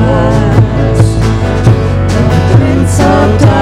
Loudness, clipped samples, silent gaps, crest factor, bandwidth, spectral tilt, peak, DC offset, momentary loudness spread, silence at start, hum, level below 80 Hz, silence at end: -9 LUFS; 1%; none; 8 dB; 12 kHz; -7 dB/octave; 0 dBFS; under 0.1%; 3 LU; 0 s; none; -18 dBFS; 0 s